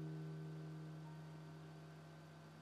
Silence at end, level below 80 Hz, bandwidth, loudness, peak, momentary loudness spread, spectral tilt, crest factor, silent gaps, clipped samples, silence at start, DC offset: 0 s; -90 dBFS; 13.5 kHz; -54 LUFS; -42 dBFS; 9 LU; -7.5 dB/octave; 12 dB; none; under 0.1%; 0 s; under 0.1%